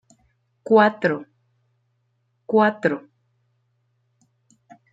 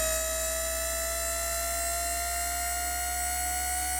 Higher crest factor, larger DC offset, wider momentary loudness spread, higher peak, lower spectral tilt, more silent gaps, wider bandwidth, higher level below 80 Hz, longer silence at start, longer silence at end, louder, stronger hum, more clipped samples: first, 22 dB vs 14 dB; neither; first, 15 LU vs 1 LU; first, -4 dBFS vs -16 dBFS; first, -7.5 dB/octave vs -1 dB/octave; neither; second, 7.8 kHz vs over 20 kHz; second, -74 dBFS vs -40 dBFS; first, 0.65 s vs 0 s; first, 1.95 s vs 0 s; first, -20 LUFS vs -29 LUFS; neither; neither